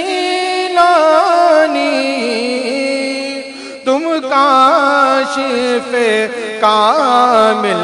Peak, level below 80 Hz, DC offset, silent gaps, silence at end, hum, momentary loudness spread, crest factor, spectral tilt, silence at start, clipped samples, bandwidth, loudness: 0 dBFS; -60 dBFS; under 0.1%; none; 0 s; none; 8 LU; 12 dB; -3 dB/octave; 0 s; 0.2%; 11 kHz; -12 LUFS